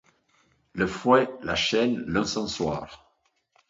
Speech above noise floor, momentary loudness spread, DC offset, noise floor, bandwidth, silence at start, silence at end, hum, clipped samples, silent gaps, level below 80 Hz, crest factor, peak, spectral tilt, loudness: 45 dB; 12 LU; under 0.1%; -70 dBFS; 7.8 kHz; 0.75 s; 0.75 s; none; under 0.1%; none; -52 dBFS; 20 dB; -6 dBFS; -4.5 dB/octave; -25 LUFS